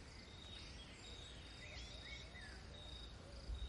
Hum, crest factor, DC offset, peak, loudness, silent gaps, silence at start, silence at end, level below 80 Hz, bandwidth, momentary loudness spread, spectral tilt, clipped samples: none; 16 dB; under 0.1%; -38 dBFS; -54 LUFS; none; 0 s; 0 s; -56 dBFS; 11.5 kHz; 3 LU; -3.5 dB/octave; under 0.1%